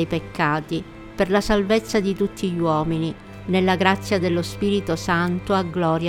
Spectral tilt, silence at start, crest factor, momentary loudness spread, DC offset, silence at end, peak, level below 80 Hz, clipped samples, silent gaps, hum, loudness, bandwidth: -6 dB/octave; 0 s; 20 dB; 7 LU; under 0.1%; 0 s; -2 dBFS; -42 dBFS; under 0.1%; none; none; -22 LUFS; 16 kHz